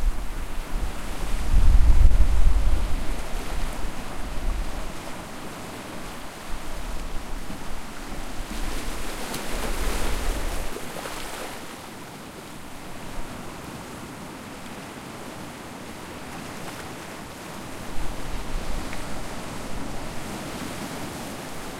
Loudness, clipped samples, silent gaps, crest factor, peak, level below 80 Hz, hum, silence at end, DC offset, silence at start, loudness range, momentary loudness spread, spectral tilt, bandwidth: -32 LUFS; under 0.1%; none; 22 dB; -2 dBFS; -26 dBFS; none; 0 s; under 0.1%; 0 s; 12 LU; 13 LU; -4.5 dB/octave; 15.5 kHz